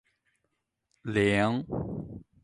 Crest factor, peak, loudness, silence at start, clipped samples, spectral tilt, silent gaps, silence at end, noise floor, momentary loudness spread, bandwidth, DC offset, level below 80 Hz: 20 dB; -12 dBFS; -28 LUFS; 1.05 s; under 0.1%; -6.5 dB/octave; none; 0.2 s; -80 dBFS; 17 LU; 11.5 kHz; under 0.1%; -54 dBFS